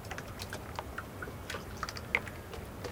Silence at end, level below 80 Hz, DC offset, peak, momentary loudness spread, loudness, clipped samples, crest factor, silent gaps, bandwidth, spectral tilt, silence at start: 0 s; -52 dBFS; under 0.1%; -12 dBFS; 9 LU; -40 LUFS; under 0.1%; 28 dB; none; 18 kHz; -4 dB/octave; 0 s